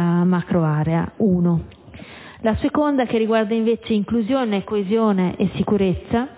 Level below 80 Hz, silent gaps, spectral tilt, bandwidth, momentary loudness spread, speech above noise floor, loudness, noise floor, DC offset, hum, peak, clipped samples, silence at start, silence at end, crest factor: -42 dBFS; none; -12 dB/octave; 4 kHz; 5 LU; 20 dB; -20 LUFS; -39 dBFS; under 0.1%; none; -6 dBFS; under 0.1%; 0 s; 0 s; 14 dB